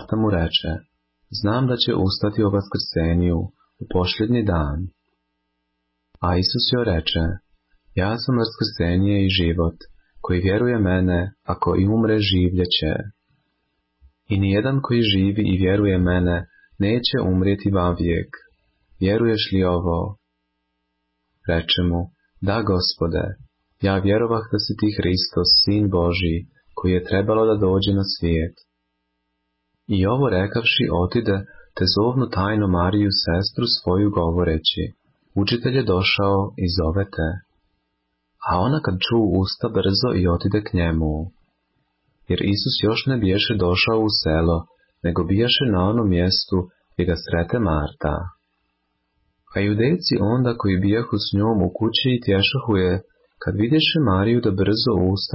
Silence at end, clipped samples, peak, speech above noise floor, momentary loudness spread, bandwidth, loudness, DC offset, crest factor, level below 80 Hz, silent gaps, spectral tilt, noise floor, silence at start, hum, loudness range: 0 s; under 0.1%; -6 dBFS; 55 dB; 8 LU; 5.8 kHz; -20 LUFS; under 0.1%; 14 dB; -34 dBFS; none; -9.5 dB/octave; -74 dBFS; 0 s; none; 4 LU